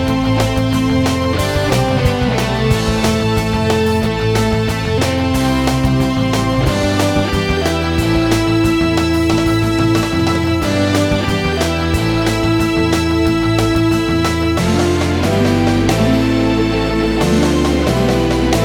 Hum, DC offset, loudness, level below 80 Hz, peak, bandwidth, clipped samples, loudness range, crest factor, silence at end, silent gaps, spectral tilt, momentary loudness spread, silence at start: none; under 0.1%; -15 LUFS; -26 dBFS; 0 dBFS; 19 kHz; under 0.1%; 1 LU; 14 dB; 0 s; none; -6 dB/octave; 2 LU; 0 s